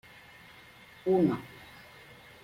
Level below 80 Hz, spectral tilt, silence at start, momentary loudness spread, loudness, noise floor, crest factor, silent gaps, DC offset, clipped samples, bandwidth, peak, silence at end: -68 dBFS; -8 dB/octave; 1.05 s; 25 LU; -29 LUFS; -54 dBFS; 18 dB; none; under 0.1%; under 0.1%; 16 kHz; -14 dBFS; 0.95 s